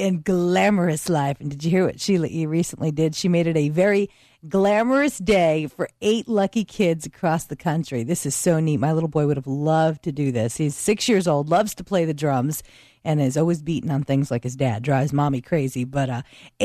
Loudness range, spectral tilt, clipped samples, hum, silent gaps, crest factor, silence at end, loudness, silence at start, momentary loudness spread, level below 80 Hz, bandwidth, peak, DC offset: 2 LU; -6 dB/octave; under 0.1%; none; none; 14 dB; 0 s; -22 LUFS; 0 s; 6 LU; -52 dBFS; 14 kHz; -8 dBFS; under 0.1%